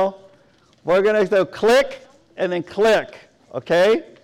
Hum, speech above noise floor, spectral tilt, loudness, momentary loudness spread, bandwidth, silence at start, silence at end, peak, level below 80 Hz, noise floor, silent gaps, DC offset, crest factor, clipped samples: none; 37 dB; -4.5 dB/octave; -18 LUFS; 17 LU; 16.5 kHz; 0 s; 0.2 s; -10 dBFS; -56 dBFS; -55 dBFS; none; under 0.1%; 10 dB; under 0.1%